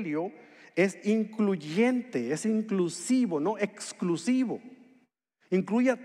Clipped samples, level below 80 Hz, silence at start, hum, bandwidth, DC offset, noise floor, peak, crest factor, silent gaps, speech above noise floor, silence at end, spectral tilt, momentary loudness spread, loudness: under 0.1%; -88 dBFS; 0 s; none; 12 kHz; under 0.1%; -70 dBFS; -10 dBFS; 18 dB; none; 41 dB; 0 s; -5.5 dB/octave; 7 LU; -29 LUFS